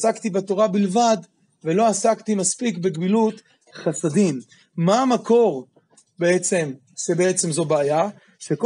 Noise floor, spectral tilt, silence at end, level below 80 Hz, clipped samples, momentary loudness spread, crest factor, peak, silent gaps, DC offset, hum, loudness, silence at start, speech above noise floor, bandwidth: -52 dBFS; -5 dB/octave; 0 s; -74 dBFS; under 0.1%; 11 LU; 16 dB; -4 dBFS; none; under 0.1%; none; -21 LUFS; 0 s; 32 dB; 11.5 kHz